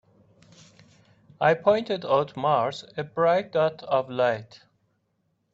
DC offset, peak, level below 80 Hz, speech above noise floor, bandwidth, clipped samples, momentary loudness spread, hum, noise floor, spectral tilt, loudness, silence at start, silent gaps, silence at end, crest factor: under 0.1%; -6 dBFS; -70 dBFS; 49 dB; 7.8 kHz; under 0.1%; 7 LU; none; -73 dBFS; -6.5 dB/octave; -25 LUFS; 1.4 s; none; 1.1 s; 20 dB